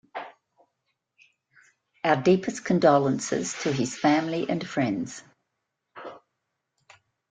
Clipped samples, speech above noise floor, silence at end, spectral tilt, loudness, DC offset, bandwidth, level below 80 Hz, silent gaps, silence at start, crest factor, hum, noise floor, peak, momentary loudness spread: under 0.1%; 57 dB; 1.15 s; -5.5 dB/octave; -25 LUFS; under 0.1%; 9.4 kHz; -68 dBFS; none; 0.15 s; 22 dB; none; -81 dBFS; -6 dBFS; 22 LU